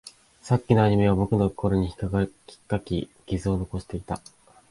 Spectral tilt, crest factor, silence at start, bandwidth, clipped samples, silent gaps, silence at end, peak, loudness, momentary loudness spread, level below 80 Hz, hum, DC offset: -8 dB/octave; 20 dB; 0.05 s; 11.5 kHz; under 0.1%; none; 0.55 s; -4 dBFS; -25 LUFS; 13 LU; -42 dBFS; none; under 0.1%